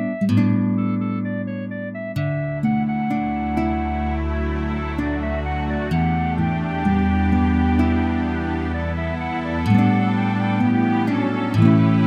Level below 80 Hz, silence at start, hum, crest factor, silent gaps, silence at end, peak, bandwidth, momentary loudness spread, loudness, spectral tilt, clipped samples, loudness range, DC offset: -32 dBFS; 0 s; none; 18 dB; none; 0 s; -2 dBFS; 8.4 kHz; 7 LU; -21 LUFS; -9 dB/octave; under 0.1%; 3 LU; under 0.1%